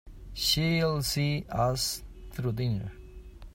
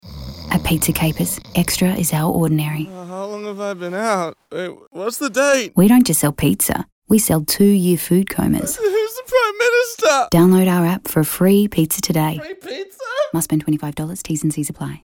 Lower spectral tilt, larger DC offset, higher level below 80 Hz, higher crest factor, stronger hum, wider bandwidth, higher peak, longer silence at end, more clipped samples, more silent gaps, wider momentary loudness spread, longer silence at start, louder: about the same, -4.5 dB/octave vs -5 dB/octave; neither; about the same, -46 dBFS vs -42 dBFS; about the same, 16 dB vs 14 dB; neither; about the same, 16.5 kHz vs 17.5 kHz; second, -14 dBFS vs -4 dBFS; about the same, 0 s vs 0.05 s; neither; second, none vs 4.87-4.91 s, 6.92-7.02 s; first, 17 LU vs 14 LU; about the same, 0.05 s vs 0.05 s; second, -29 LUFS vs -17 LUFS